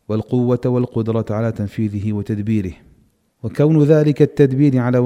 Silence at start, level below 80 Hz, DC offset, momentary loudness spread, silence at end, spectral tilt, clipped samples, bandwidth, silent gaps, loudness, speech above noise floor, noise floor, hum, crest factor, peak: 0.1 s; -48 dBFS; under 0.1%; 9 LU; 0 s; -9.5 dB/octave; under 0.1%; 10 kHz; none; -17 LUFS; 40 dB; -56 dBFS; none; 16 dB; 0 dBFS